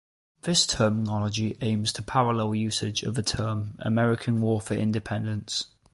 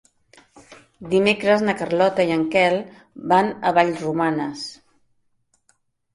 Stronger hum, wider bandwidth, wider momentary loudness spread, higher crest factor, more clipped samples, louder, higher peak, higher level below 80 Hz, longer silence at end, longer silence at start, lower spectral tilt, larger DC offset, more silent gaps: neither; about the same, 11.5 kHz vs 11.5 kHz; second, 7 LU vs 15 LU; about the same, 18 dB vs 20 dB; neither; second, -26 LUFS vs -20 LUFS; second, -8 dBFS vs -2 dBFS; first, -52 dBFS vs -60 dBFS; second, 0.3 s vs 1.4 s; second, 0.45 s vs 0.7 s; about the same, -4.5 dB/octave vs -5.5 dB/octave; neither; neither